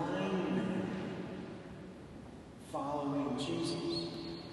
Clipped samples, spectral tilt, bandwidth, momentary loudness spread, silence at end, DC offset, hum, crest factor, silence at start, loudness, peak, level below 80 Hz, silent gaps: under 0.1%; -6 dB/octave; 12 kHz; 15 LU; 0 s; under 0.1%; none; 14 dB; 0 s; -38 LUFS; -24 dBFS; -62 dBFS; none